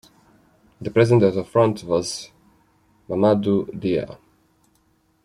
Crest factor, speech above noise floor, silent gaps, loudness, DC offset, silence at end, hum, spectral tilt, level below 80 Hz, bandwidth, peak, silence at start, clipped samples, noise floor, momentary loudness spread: 18 dB; 44 dB; none; -20 LUFS; under 0.1%; 1.1 s; none; -6.5 dB/octave; -58 dBFS; 13 kHz; -4 dBFS; 0.8 s; under 0.1%; -63 dBFS; 16 LU